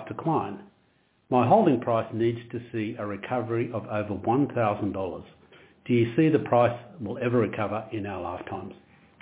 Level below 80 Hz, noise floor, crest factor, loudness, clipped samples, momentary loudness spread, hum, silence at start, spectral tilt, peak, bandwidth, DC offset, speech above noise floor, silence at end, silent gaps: -58 dBFS; -66 dBFS; 20 dB; -26 LUFS; under 0.1%; 15 LU; none; 0 s; -11.5 dB/octave; -8 dBFS; 4 kHz; under 0.1%; 40 dB; 0.5 s; none